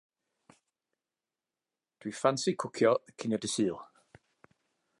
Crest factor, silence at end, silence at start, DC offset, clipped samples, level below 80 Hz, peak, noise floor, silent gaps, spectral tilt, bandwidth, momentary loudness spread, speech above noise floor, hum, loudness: 24 dB; 1.15 s; 2.05 s; under 0.1%; under 0.1%; -76 dBFS; -12 dBFS; under -90 dBFS; none; -4.5 dB/octave; 11.5 kHz; 15 LU; over 60 dB; none; -31 LUFS